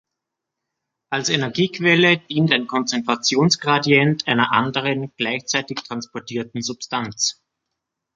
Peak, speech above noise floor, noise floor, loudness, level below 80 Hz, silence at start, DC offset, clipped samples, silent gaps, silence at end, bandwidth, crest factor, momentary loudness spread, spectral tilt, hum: -2 dBFS; 62 dB; -82 dBFS; -19 LUFS; -64 dBFS; 1.1 s; under 0.1%; under 0.1%; none; 0.85 s; 9.2 kHz; 20 dB; 12 LU; -4 dB/octave; none